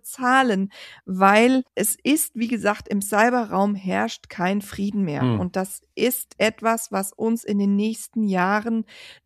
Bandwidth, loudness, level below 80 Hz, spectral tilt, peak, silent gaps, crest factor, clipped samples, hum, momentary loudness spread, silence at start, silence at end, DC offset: 15 kHz; -22 LUFS; -60 dBFS; -4.5 dB/octave; -2 dBFS; none; 20 dB; under 0.1%; none; 9 LU; 0.05 s; 0.1 s; under 0.1%